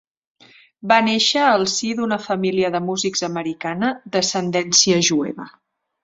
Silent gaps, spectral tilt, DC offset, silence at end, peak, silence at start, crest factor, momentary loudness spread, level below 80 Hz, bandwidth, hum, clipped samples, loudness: none; -3 dB/octave; under 0.1%; 0.55 s; 0 dBFS; 0.85 s; 20 dB; 11 LU; -62 dBFS; 7.8 kHz; none; under 0.1%; -18 LUFS